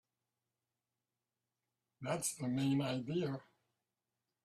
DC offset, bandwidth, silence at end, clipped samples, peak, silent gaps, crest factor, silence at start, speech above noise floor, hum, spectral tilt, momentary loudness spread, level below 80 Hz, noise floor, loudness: under 0.1%; 14 kHz; 1.05 s; under 0.1%; -24 dBFS; none; 20 dB; 2 s; over 53 dB; none; -5 dB/octave; 10 LU; -78 dBFS; under -90 dBFS; -38 LUFS